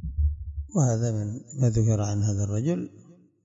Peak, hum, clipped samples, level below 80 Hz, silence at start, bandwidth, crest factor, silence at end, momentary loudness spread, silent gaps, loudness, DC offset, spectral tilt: -10 dBFS; none; under 0.1%; -36 dBFS; 0 s; 7.8 kHz; 16 dB; 0.35 s; 9 LU; none; -26 LUFS; under 0.1%; -7.5 dB/octave